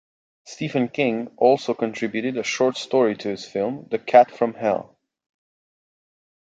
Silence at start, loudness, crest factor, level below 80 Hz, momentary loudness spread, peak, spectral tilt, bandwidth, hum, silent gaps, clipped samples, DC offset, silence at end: 0.45 s; -22 LUFS; 20 dB; -68 dBFS; 11 LU; -2 dBFS; -5 dB/octave; 9 kHz; none; none; under 0.1%; under 0.1%; 1.7 s